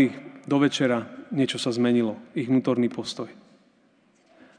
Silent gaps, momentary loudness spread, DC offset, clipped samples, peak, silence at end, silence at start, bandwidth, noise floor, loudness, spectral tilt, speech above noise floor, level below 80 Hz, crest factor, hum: none; 11 LU; under 0.1%; under 0.1%; -8 dBFS; 1.25 s; 0 s; 10 kHz; -62 dBFS; -25 LUFS; -5.5 dB/octave; 38 dB; -78 dBFS; 18 dB; none